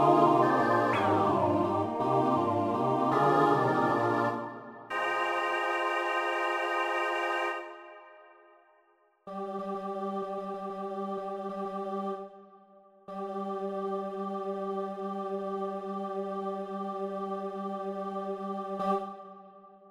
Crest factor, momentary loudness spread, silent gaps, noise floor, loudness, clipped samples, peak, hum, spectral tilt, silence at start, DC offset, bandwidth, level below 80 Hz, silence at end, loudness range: 20 dB; 12 LU; none; -67 dBFS; -30 LUFS; under 0.1%; -10 dBFS; none; -6.5 dB/octave; 0 s; under 0.1%; 15.5 kHz; -72 dBFS; 0 s; 11 LU